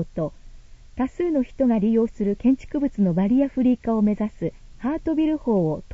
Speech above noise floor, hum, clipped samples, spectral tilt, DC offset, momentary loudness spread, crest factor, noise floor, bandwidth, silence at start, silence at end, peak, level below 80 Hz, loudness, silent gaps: 21 dB; none; under 0.1%; -9.5 dB/octave; under 0.1%; 10 LU; 12 dB; -43 dBFS; 7.6 kHz; 0 s; 0 s; -10 dBFS; -44 dBFS; -23 LUFS; none